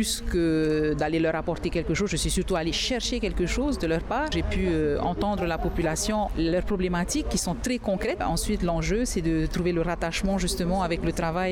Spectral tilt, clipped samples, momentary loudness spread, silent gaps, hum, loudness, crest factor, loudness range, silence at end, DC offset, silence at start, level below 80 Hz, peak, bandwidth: -4.5 dB/octave; under 0.1%; 3 LU; none; none; -26 LUFS; 10 dB; 1 LU; 0 s; under 0.1%; 0 s; -34 dBFS; -16 dBFS; 17.5 kHz